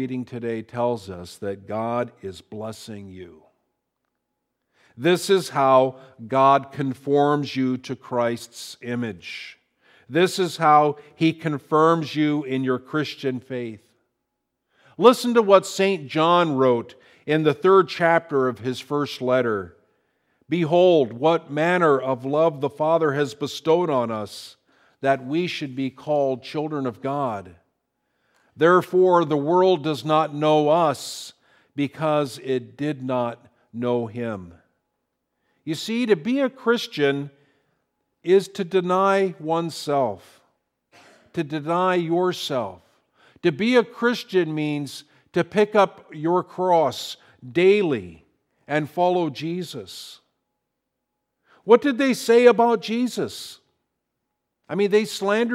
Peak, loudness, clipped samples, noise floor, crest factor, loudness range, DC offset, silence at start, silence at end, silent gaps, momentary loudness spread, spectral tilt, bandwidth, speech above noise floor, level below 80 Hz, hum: 0 dBFS; -22 LUFS; under 0.1%; -80 dBFS; 22 dB; 7 LU; under 0.1%; 0 s; 0 s; none; 17 LU; -5.5 dB/octave; 15.5 kHz; 58 dB; -70 dBFS; none